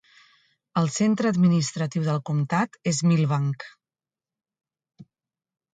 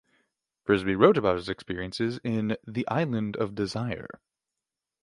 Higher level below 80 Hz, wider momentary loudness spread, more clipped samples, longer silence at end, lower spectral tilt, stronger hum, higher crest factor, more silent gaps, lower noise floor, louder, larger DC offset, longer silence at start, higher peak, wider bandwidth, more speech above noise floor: second, -66 dBFS vs -56 dBFS; second, 8 LU vs 13 LU; neither; second, 0.7 s vs 0.9 s; about the same, -6 dB/octave vs -7 dB/octave; neither; second, 16 dB vs 24 dB; neither; about the same, under -90 dBFS vs -88 dBFS; first, -24 LUFS vs -27 LUFS; neither; about the same, 0.75 s vs 0.65 s; second, -10 dBFS vs -6 dBFS; second, 9.4 kHz vs 11.5 kHz; first, over 67 dB vs 61 dB